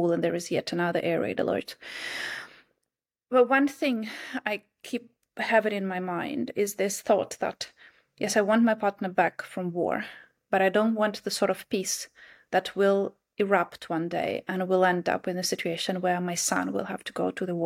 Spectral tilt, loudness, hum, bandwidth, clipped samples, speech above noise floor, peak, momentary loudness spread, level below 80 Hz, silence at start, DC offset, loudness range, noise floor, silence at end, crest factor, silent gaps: -4 dB/octave; -27 LUFS; none; 16.5 kHz; under 0.1%; 59 dB; -10 dBFS; 11 LU; -72 dBFS; 0 s; under 0.1%; 2 LU; -86 dBFS; 0 s; 18 dB; none